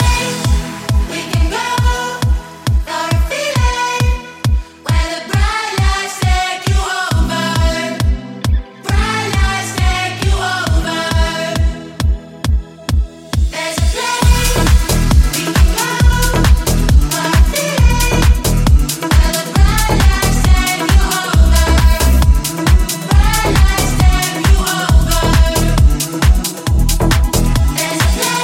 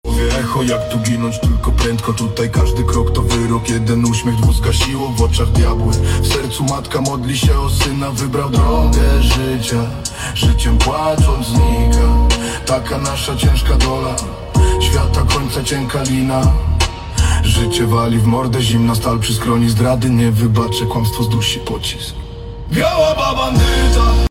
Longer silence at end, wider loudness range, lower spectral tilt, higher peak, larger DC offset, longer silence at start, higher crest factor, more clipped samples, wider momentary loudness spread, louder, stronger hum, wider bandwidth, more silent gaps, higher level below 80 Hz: about the same, 0 s vs 0.05 s; about the same, 4 LU vs 2 LU; about the same, -4.5 dB/octave vs -5 dB/octave; about the same, 0 dBFS vs 0 dBFS; neither; about the same, 0 s vs 0.05 s; about the same, 12 dB vs 14 dB; neither; about the same, 6 LU vs 5 LU; about the same, -14 LUFS vs -15 LUFS; neither; about the same, 17 kHz vs 16.5 kHz; neither; about the same, -14 dBFS vs -18 dBFS